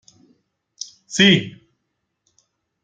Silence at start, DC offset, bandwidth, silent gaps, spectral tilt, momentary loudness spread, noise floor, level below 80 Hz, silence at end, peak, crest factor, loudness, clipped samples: 1.1 s; under 0.1%; 9.2 kHz; none; -4 dB/octave; 22 LU; -75 dBFS; -60 dBFS; 1.35 s; 0 dBFS; 22 dB; -16 LUFS; under 0.1%